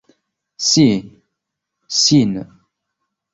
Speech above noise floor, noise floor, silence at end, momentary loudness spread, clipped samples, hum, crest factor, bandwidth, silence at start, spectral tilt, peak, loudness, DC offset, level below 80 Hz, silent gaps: 65 dB; -79 dBFS; 0.9 s; 10 LU; under 0.1%; none; 18 dB; 8 kHz; 0.6 s; -4 dB/octave; -2 dBFS; -15 LUFS; under 0.1%; -54 dBFS; none